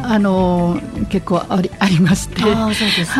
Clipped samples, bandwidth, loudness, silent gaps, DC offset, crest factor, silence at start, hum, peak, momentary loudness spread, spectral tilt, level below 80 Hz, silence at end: under 0.1%; 14 kHz; -16 LUFS; none; under 0.1%; 16 dB; 0 s; none; 0 dBFS; 6 LU; -5.5 dB/octave; -34 dBFS; 0 s